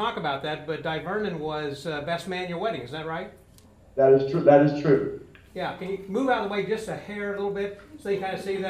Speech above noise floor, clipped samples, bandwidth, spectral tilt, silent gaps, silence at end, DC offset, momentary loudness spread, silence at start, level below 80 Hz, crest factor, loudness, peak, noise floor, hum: 28 dB; under 0.1%; 13 kHz; -6.5 dB/octave; none; 0 s; under 0.1%; 15 LU; 0 s; -58 dBFS; 22 dB; -26 LUFS; -4 dBFS; -53 dBFS; none